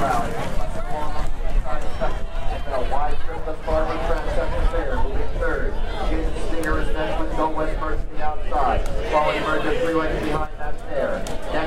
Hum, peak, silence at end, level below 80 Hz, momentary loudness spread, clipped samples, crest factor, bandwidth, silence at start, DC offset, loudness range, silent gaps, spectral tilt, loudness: none; -6 dBFS; 0 s; -24 dBFS; 8 LU; under 0.1%; 12 dB; 10.5 kHz; 0 s; under 0.1%; 4 LU; none; -6 dB/octave; -25 LUFS